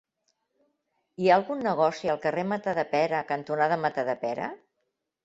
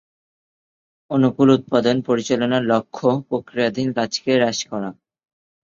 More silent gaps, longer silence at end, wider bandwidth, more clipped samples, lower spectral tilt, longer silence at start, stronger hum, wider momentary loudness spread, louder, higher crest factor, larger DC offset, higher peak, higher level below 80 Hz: neither; about the same, 0.7 s vs 0.75 s; about the same, 8 kHz vs 7.6 kHz; neither; about the same, -6 dB/octave vs -5.5 dB/octave; about the same, 1.2 s vs 1.1 s; neither; about the same, 8 LU vs 9 LU; second, -27 LUFS vs -20 LUFS; about the same, 20 dB vs 18 dB; neither; second, -8 dBFS vs -4 dBFS; second, -70 dBFS vs -60 dBFS